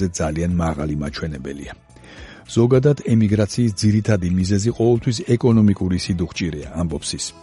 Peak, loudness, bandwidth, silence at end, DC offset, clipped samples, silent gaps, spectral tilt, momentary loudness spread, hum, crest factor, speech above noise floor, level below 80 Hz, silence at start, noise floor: -4 dBFS; -19 LUFS; 11.5 kHz; 0.1 s; under 0.1%; under 0.1%; none; -6.5 dB/octave; 12 LU; none; 16 dB; 22 dB; -38 dBFS; 0 s; -40 dBFS